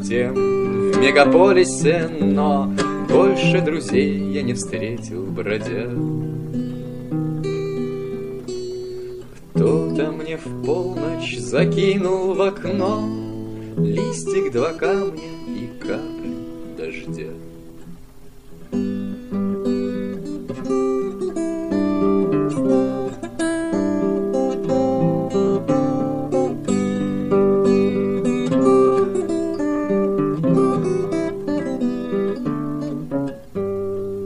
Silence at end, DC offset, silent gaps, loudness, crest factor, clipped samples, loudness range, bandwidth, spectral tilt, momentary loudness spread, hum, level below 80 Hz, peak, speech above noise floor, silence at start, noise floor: 0 s; 0.8%; none; -20 LUFS; 20 dB; under 0.1%; 9 LU; 11 kHz; -6.5 dB/octave; 13 LU; none; -48 dBFS; 0 dBFS; 22 dB; 0 s; -41 dBFS